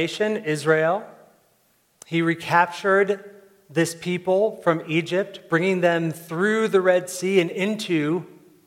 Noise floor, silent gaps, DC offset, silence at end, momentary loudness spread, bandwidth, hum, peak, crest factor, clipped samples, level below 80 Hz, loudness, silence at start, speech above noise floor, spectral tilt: -64 dBFS; none; under 0.1%; 0.4 s; 7 LU; 16.5 kHz; none; -4 dBFS; 20 dB; under 0.1%; -74 dBFS; -22 LUFS; 0 s; 42 dB; -5.5 dB/octave